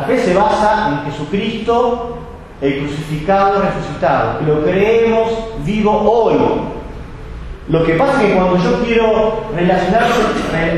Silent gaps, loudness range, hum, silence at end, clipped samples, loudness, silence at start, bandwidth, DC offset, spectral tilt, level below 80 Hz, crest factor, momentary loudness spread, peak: none; 3 LU; none; 0 s; under 0.1%; -14 LUFS; 0 s; 12.5 kHz; under 0.1%; -6.5 dB/octave; -32 dBFS; 14 dB; 12 LU; 0 dBFS